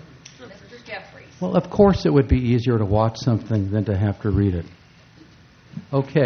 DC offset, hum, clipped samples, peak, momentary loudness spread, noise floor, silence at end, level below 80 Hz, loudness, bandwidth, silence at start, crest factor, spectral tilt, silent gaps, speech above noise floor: under 0.1%; none; under 0.1%; -2 dBFS; 23 LU; -49 dBFS; 0 s; -36 dBFS; -20 LUFS; 6.6 kHz; 0.4 s; 20 dB; -8.5 dB/octave; none; 30 dB